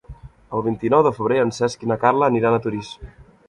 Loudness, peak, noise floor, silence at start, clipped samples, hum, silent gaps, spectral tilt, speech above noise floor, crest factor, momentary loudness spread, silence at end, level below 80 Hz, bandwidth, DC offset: -20 LUFS; -2 dBFS; -41 dBFS; 0.1 s; under 0.1%; none; none; -6.5 dB/octave; 22 dB; 18 dB; 12 LU; 0.25 s; -48 dBFS; 11.5 kHz; under 0.1%